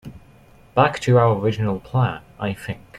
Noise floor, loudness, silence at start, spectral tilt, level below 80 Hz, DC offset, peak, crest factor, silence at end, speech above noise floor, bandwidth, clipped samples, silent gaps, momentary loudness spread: -49 dBFS; -21 LUFS; 0.05 s; -7 dB/octave; -50 dBFS; under 0.1%; -2 dBFS; 18 dB; 0 s; 30 dB; 12 kHz; under 0.1%; none; 12 LU